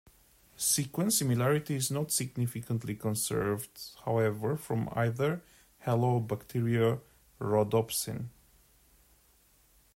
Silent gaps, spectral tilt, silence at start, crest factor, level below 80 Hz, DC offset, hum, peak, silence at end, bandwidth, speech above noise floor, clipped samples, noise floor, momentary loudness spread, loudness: none; -5 dB/octave; 0.6 s; 18 dB; -62 dBFS; under 0.1%; none; -14 dBFS; 1.65 s; 16 kHz; 35 dB; under 0.1%; -65 dBFS; 10 LU; -31 LUFS